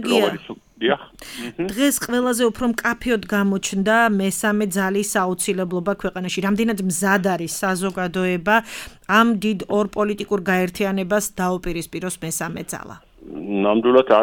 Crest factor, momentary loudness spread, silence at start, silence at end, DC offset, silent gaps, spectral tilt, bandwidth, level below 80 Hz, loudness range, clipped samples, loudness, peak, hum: 18 dB; 11 LU; 0 s; 0 s; under 0.1%; none; -4.5 dB/octave; 19 kHz; -48 dBFS; 3 LU; under 0.1%; -20 LUFS; -2 dBFS; none